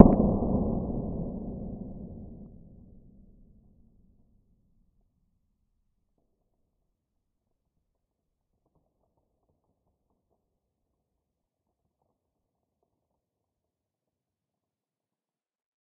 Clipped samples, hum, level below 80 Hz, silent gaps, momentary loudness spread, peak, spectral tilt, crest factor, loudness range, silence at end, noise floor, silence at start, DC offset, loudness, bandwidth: under 0.1%; none; -44 dBFS; none; 21 LU; 0 dBFS; -5.5 dB/octave; 32 dB; 22 LU; 13.5 s; under -90 dBFS; 0 s; under 0.1%; -28 LUFS; 1.4 kHz